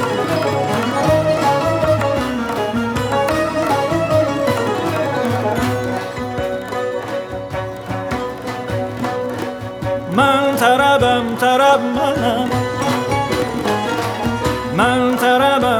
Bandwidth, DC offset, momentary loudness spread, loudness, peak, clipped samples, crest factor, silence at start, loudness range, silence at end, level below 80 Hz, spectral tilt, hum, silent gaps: 20 kHz; under 0.1%; 10 LU; -17 LUFS; 0 dBFS; under 0.1%; 16 dB; 0 s; 8 LU; 0 s; -42 dBFS; -5.5 dB/octave; none; none